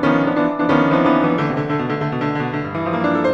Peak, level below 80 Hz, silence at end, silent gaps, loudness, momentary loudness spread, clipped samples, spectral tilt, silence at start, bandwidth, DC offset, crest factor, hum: -4 dBFS; -50 dBFS; 0 s; none; -18 LUFS; 7 LU; under 0.1%; -8 dB/octave; 0 s; 7.2 kHz; under 0.1%; 14 dB; none